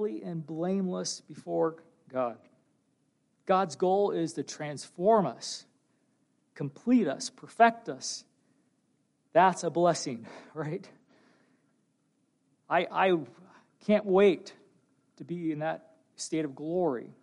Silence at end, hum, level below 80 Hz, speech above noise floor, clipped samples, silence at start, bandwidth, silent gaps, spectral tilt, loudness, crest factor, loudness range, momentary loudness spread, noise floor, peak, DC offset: 0.1 s; none; -82 dBFS; 45 dB; under 0.1%; 0 s; 11.5 kHz; none; -5 dB/octave; -29 LUFS; 22 dB; 5 LU; 15 LU; -73 dBFS; -10 dBFS; under 0.1%